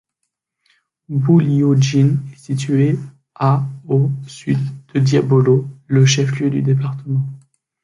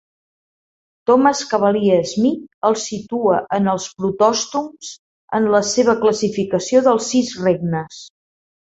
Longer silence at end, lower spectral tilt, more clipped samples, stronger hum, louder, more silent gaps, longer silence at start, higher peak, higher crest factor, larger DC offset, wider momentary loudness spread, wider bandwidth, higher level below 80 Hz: second, 0.45 s vs 0.6 s; first, -6.5 dB/octave vs -4.5 dB/octave; neither; neither; about the same, -17 LUFS vs -17 LUFS; second, none vs 2.54-2.62 s, 4.99-5.28 s; about the same, 1.1 s vs 1.1 s; about the same, -2 dBFS vs -2 dBFS; about the same, 14 dB vs 16 dB; neither; about the same, 10 LU vs 10 LU; first, 10.5 kHz vs 8.2 kHz; about the same, -56 dBFS vs -58 dBFS